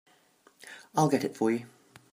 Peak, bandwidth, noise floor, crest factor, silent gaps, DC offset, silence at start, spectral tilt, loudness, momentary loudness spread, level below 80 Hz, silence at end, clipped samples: -12 dBFS; 15.5 kHz; -63 dBFS; 20 dB; none; under 0.1%; 0.65 s; -6 dB/octave; -29 LUFS; 20 LU; -76 dBFS; 0.45 s; under 0.1%